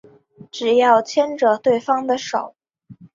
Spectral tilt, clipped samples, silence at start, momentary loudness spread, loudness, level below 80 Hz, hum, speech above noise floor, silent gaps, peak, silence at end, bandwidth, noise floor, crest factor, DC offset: -4 dB/octave; under 0.1%; 0.55 s; 11 LU; -18 LUFS; -68 dBFS; none; 28 dB; none; -2 dBFS; 0.1 s; 7.6 kHz; -46 dBFS; 16 dB; under 0.1%